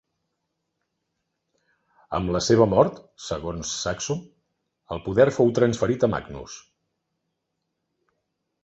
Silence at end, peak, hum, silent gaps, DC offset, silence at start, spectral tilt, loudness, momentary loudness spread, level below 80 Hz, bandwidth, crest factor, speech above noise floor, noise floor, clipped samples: 2.05 s; -4 dBFS; none; none; under 0.1%; 2.1 s; -5.5 dB/octave; -23 LUFS; 18 LU; -50 dBFS; 8.2 kHz; 22 dB; 57 dB; -79 dBFS; under 0.1%